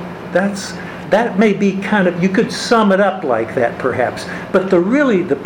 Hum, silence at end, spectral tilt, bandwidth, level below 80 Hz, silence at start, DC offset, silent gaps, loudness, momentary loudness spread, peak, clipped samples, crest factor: none; 0 s; -6 dB/octave; 16.5 kHz; -52 dBFS; 0 s; under 0.1%; none; -15 LUFS; 7 LU; 0 dBFS; under 0.1%; 14 dB